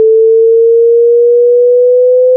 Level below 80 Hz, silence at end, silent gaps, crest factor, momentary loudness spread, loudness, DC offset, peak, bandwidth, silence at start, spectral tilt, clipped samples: under -90 dBFS; 0 s; none; 4 dB; 0 LU; -6 LUFS; under 0.1%; -2 dBFS; 0.6 kHz; 0 s; -13 dB/octave; under 0.1%